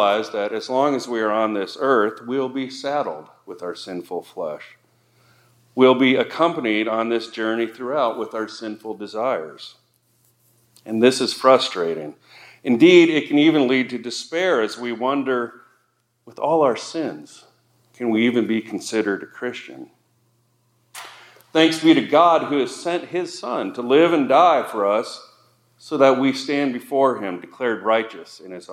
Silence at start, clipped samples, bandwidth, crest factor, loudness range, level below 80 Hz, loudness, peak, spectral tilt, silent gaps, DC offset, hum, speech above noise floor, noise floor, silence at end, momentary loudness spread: 0 s; under 0.1%; 14 kHz; 20 dB; 8 LU; -78 dBFS; -20 LUFS; -2 dBFS; -4.5 dB/octave; none; under 0.1%; none; 47 dB; -67 dBFS; 0 s; 17 LU